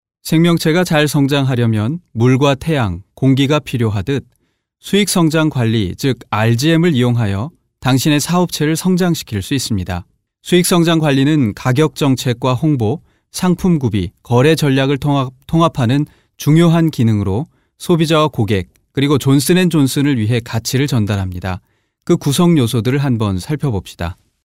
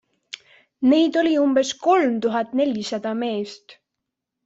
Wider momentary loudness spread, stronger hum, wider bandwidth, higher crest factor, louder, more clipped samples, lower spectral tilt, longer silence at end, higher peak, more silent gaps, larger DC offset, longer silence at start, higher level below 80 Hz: second, 9 LU vs 20 LU; neither; first, 16 kHz vs 8 kHz; about the same, 14 dB vs 16 dB; first, -15 LUFS vs -20 LUFS; neither; first, -6 dB/octave vs -4.5 dB/octave; second, 0.3 s vs 0.75 s; first, 0 dBFS vs -6 dBFS; neither; neither; second, 0.25 s vs 0.8 s; first, -44 dBFS vs -68 dBFS